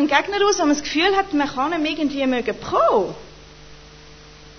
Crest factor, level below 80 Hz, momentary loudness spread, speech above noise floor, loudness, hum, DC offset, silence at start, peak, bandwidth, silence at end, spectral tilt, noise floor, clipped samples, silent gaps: 20 dB; -48 dBFS; 5 LU; 24 dB; -20 LUFS; none; under 0.1%; 0 s; -2 dBFS; 6.6 kHz; 0 s; -3 dB/octave; -43 dBFS; under 0.1%; none